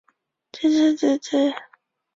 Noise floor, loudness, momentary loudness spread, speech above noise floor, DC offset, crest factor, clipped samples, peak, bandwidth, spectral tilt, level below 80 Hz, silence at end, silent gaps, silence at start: -65 dBFS; -21 LUFS; 6 LU; 45 dB; under 0.1%; 14 dB; under 0.1%; -8 dBFS; 7.8 kHz; -3.5 dB/octave; -68 dBFS; 0.55 s; none; 0.55 s